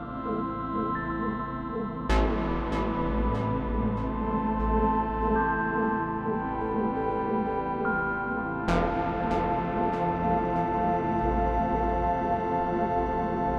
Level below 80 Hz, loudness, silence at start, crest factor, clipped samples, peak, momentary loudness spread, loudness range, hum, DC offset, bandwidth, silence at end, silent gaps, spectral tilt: -36 dBFS; -28 LUFS; 0 s; 16 dB; under 0.1%; -12 dBFS; 4 LU; 2 LU; none; under 0.1%; 8.4 kHz; 0 s; none; -8 dB/octave